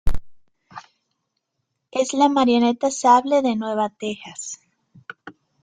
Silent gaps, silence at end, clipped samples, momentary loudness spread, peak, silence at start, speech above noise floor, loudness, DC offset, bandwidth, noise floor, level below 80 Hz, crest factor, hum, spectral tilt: none; 0.3 s; under 0.1%; 22 LU; -2 dBFS; 0.05 s; 58 dB; -20 LUFS; under 0.1%; 9.6 kHz; -77 dBFS; -38 dBFS; 20 dB; none; -4 dB/octave